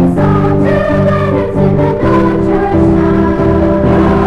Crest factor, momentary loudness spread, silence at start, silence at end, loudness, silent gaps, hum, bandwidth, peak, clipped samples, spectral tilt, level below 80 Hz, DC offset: 10 dB; 2 LU; 0 s; 0 s; -10 LUFS; none; none; 9 kHz; 0 dBFS; under 0.1%; -9.5 dB/octave; -24 dBFS; under 0.1%